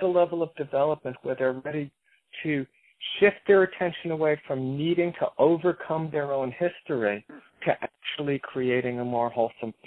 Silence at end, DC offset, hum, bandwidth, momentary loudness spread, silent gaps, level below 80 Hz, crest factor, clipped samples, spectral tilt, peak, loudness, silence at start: 0.15 s; under 0.1%; none; 4.4 kHz; 11 LU; none; -68 dBFS; 18 dB; under 0.1%; -9 dB/octave; -8 dBFS; -27 LUFS; 0 s